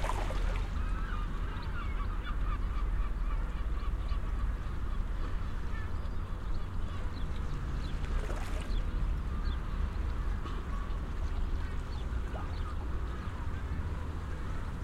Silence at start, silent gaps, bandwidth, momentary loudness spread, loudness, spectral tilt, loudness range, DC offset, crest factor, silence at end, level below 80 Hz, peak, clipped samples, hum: 0 s; none; 10.5 kHz; 3 LU; -38 LUFS; -6.5 dB/octave; 2 LU; under 0.1%; 12 dB; 0 s; -34 dBFS; -20 dBFS; under 0.1%; none